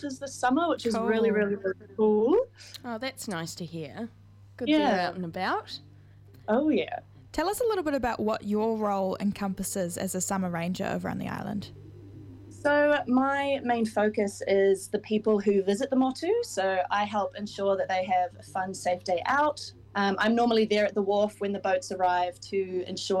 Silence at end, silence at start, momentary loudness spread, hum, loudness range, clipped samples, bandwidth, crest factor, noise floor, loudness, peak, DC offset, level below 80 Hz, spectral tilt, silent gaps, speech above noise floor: 0 s; 0 s; 13 LU; none; 4 LU; under 0.1%; 16 kHz; 16 dB; -52 dBFS; -28 LUFS; -12 dBFS; under 0.1%; -60 dBFS; -5 dB/octave; none; 25 dB